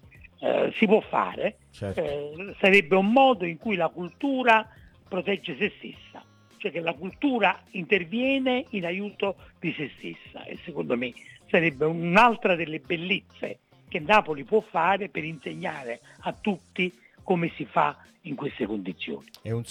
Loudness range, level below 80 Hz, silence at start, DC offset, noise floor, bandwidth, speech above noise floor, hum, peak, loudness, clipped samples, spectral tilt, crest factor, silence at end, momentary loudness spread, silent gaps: 7 LU; -62 dBFS; 0.4 s; under 0.1%; -50 dBFS; 13 kHz; 24 dB; none; -6 dBFS; -26 LUFS; under 0.1%; -6.5 dB/octave; 20 dB; 0 s; 17 LU; none